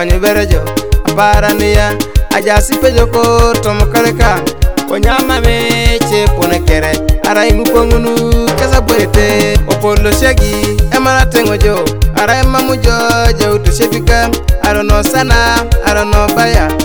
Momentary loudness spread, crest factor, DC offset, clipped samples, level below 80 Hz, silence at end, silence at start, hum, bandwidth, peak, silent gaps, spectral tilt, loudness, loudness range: 4 LU; 10 dB; 3%; 0.9%; -14 dBFS; 0 s; 0 s; none; over 20 kHz; 0 dBFS; none; -5 dB/octave; -10 LUFS; 1 LU